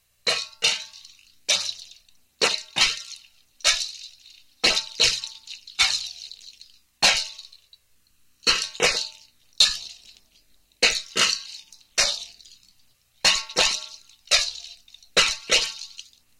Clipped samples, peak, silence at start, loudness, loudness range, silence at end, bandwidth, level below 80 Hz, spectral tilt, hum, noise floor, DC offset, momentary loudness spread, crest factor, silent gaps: under 0.1%; -2 dBFS; 0.25 s; -22 LUFS; 2 LU; 0.35 s; 17 kHz; -54 dBFS; 1 dB/octave; none; -62 dBFS; under 0.1%; 20 LU; 24 dB; none